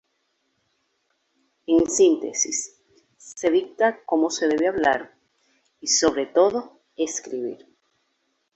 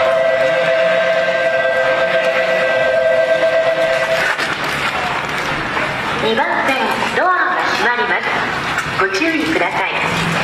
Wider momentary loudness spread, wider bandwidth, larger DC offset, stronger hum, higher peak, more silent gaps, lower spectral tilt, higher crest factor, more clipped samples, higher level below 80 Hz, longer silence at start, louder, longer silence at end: first, 14 LU vs 4 LU; second, 8.4 kHz vs 14 kHz; neither; neither; about the same, -4 dBFS vs -4 dBFS; neither; second, -2 dB/octave vs -4 dB/octave; first, 20 dB vs 12 dB; neither; second, -60 dBFS vs -46 dBFS; first, 1.7 s vs 0 s; second, -22 LUFS vs -15 LUFS; first, 1 s vs 0 s